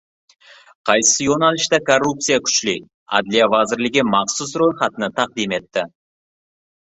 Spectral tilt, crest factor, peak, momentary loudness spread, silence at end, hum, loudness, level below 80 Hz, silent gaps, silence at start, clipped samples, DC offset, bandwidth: -2.5 dB/octave; 18 dB; 0 dBFS; 9 LU; 0.95 s; none; -17 LUFS; -58 dBFS; 2.94-3.06 s; 0.85 s; under 0.1%; under 0.1%; 8.4 kHz